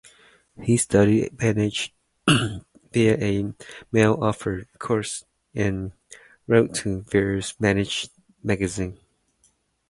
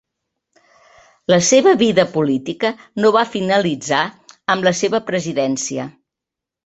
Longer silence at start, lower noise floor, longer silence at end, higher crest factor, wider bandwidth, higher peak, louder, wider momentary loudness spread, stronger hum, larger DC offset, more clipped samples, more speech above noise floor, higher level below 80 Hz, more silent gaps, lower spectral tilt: second, 0.6 s vs 1.3 s; second, -65 dBFS vs -85 dBFS; first, 0.95 s vs 0.75 s; about the same, 20 dB vs 16 dB; first, 11.5 kHz vs 8.2 kHz; about the same, -2 dBFS vs -2 dBFS; second, -23 LUFS vs -17 LUFS; about the same, 13 LU vs 12 LU; neither; neither; neither; second, 43 dB vs 69 dB; first, -48 dBFS vs -60 dBFS; neither; about the same, -5 dB/octave vs -4 dB/octave